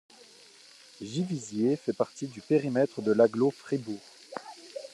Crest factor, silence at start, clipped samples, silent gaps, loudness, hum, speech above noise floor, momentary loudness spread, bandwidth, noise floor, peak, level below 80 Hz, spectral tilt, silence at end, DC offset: 20 dB; 1 s; under 0.1%; none; -29 LUFS; none; 27 dB; 19 LU; 12 kHz; -55 dBFS; -10 dBFS; -78 dBFS; -6.5 dB/octave; 0.05 s; under 0.1%